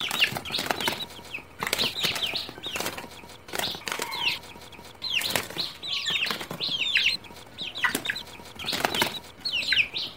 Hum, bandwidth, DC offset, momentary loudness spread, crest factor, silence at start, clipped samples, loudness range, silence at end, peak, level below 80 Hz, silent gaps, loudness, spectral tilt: none; 16.5 kHz; 0.2%; 14 LU; 26 dB; 0 s; under 0.1%; 3 LU; 0 s; -4 dBFS; -58 dBFS; none; -27 LUFS; -1.5 dB/octave